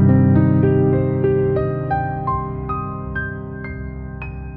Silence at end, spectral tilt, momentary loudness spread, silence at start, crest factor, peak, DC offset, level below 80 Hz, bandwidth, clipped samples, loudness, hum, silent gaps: 0 s; -13.5 dB/octave; 16 LU; 0 s; 14 dB; -4 dBFS; under 0.1%; -36 dBFS; 4 kHz; under 0.1%; -19 LUFS; none; none